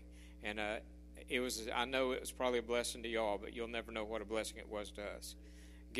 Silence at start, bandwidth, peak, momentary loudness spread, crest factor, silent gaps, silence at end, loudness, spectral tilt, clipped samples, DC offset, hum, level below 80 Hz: 0 s; 14.5 kHz; -20 dBFS; 16 LU; 22 dB; none; 0 s; -40 LUFS; -3 dB/octave; under 0.1%; under 0.1%; none; -56 dBFS